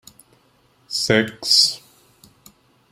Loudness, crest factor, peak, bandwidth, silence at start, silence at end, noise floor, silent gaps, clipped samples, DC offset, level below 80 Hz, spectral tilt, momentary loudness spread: -17 LUFS; 22 dB; -2 dBFS; 16 kHz; 0.9 s; 1.15 s; -59 dBFS; none; under 0.1%; under 0.1%; -58 dBFS; -2 dB/octave; 13 LU